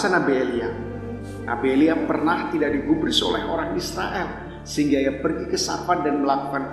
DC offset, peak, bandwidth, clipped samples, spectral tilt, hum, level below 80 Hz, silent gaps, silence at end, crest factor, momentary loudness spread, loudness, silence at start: under 0.1%; -6 dBFS; 13 kHz; under 0.1%; -4.5 dB/octave; none; -44 dBFS; none; 0 s; 16 dB; 11 LU; -23 LUFS; 0 s